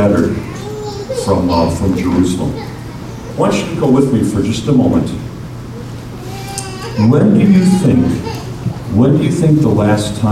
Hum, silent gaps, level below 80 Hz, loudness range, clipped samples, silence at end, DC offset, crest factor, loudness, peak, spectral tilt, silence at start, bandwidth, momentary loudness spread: none; none; -34 dBFS; 4 LU; under 0.1%; 0 s; under 0.1%; 12 dB; -13 LUFS; 0 dBFS; -7 dB/octave; 0 s; 15 kHz; 17 LU